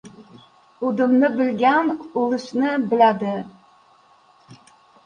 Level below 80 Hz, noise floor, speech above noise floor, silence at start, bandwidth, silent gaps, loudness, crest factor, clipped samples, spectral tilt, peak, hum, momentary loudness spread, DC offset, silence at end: -68 dBFS; -55 dBFS; 36 dB; 0.05 s; 9.2 kHz; none; -20 LUFS; 18 dB; under 0.1%; -6.5 dB/octave; -4 dBFS; none; 10 LU; under 0.1%; 0.5 s